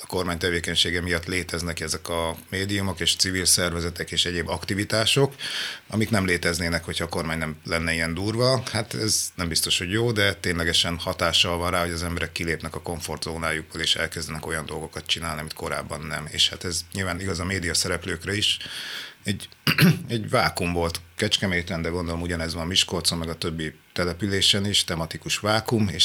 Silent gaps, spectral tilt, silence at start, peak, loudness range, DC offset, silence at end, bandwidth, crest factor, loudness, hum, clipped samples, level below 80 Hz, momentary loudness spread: none; -3 dB/octave; 0 s; -4 dBFS; 4 LU; under 0.1%; 0 s; over 20 kHz; 20 dB; -24 LUFS; none; under 0.1%; -46 dBFS; 10 LU